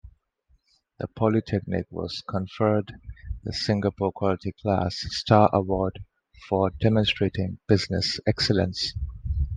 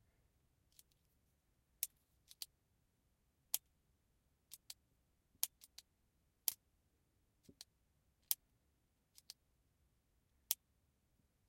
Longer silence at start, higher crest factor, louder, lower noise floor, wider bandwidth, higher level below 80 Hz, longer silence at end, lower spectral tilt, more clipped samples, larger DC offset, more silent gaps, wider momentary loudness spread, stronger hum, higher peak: second, 0.05 s vs 1.8 s; second, 22 dB vs 44 dB; first, -25 LUFS vs -45 LUFS; second, -66 dBFS vs -81 dBFS; second, 9.4 kHz vs 16.5 kHz; first, -40 dBFS vs -84 dBFS; second, 0 s vs 0.95 s; first, -6 dB/octave vs 1.5 dB/octave; neither; neither; neither; second, 11 LU vs 19 LU; neither; first, -2 dBFS vs -10 dBFS